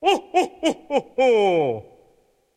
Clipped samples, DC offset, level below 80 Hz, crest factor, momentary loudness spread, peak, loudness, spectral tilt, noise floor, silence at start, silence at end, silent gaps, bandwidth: under 0.1%; under 0.1%; -64 dBFS; 16 dB; 8 LU; -6 dBFS; -21 LUFS; -4.5 dB/octave; -61 dBFS; 0 s; 0.75 s; none; 13.5 kHz